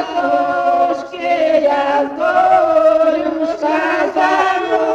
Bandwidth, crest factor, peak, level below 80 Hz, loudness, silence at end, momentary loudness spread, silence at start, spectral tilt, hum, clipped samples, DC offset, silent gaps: 8.8 kHz; 12 dB; -2 dBFS; -54 dBFS; -14 LUFS; 0 s; 6 LU; 0 s; -4 dB/octave; none; under 0.1%; under 0.1%; none